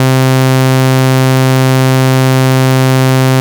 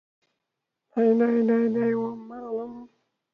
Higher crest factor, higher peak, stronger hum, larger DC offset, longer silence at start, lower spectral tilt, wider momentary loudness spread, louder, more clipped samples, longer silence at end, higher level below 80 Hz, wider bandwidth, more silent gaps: second, 6 dB vs 14 dB; first, -2 dBFS vs -12 dBFS; neither; neither; second, 0 s vs 0.95 s; second, -6 dB/octave vs -9.5 dB/octave; second, 0 LU vs 13 LU; first, -9 LUFS vs -24 LUFS; neither; second, 0 s vs 0.45 s; about the same, -68 dBFS vs -72 dBFS; first, over 20 kHz vs 3.8 kHz; neither